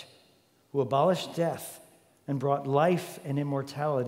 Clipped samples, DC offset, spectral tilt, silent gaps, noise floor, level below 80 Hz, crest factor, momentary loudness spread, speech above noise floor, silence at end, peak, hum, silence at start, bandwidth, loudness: under 0.1%; under 0.1%; -6.5 dB/octave; none; -64 dBFS; -76 dBFS; 18 dB; 13 LU; 36 dB; 0 s; -12 dBFS; none; 0 s; 16 kHz; -29 LUFS